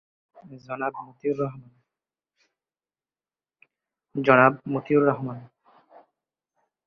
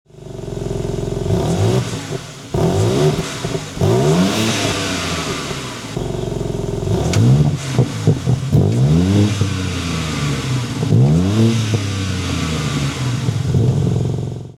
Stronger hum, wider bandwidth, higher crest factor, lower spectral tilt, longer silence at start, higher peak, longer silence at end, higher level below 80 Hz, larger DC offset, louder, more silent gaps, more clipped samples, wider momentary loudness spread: neither; second, 6.2 kHz vs 14.5 kHz; first, 24 dB vs 14 dB; first, -9 dB/octave vs -6 dB/octave; first, 0.5 s vs 0.15 s; about the same, -4 dBFS vs -2 dBFS; first, 1.4 s vs 0.05 s; second, -70 dBFS vs -36 dBFS; neither; second, -23 LUFS vs -18 LUFS; neither; neither; first, 18 LU vs 10 LU